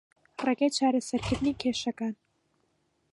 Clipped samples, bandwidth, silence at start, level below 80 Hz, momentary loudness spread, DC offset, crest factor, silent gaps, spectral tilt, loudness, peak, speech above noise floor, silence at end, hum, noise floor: under 0.1%; 11.5 kHz; 0.4 s; -54 dBFS; 11 LU; under 0.1%; 18 dB; none; -4.5 dB/octave; -29 LUFS; -14 dBFS; 45 dB; 1 s; none; -73 dBFS